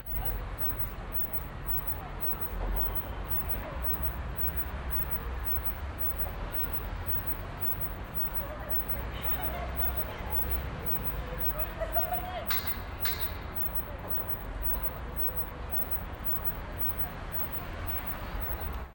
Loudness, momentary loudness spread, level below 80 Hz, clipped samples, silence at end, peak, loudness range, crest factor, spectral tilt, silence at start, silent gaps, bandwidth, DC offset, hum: -31 LUFS; 4 LU; -40 dBFS; under 0.1%; 0 s; -16 dBFS; 1 LU; 16 dB; -6 dB/octave; 0 s; none; 16.5 kHz; under 0.1%; none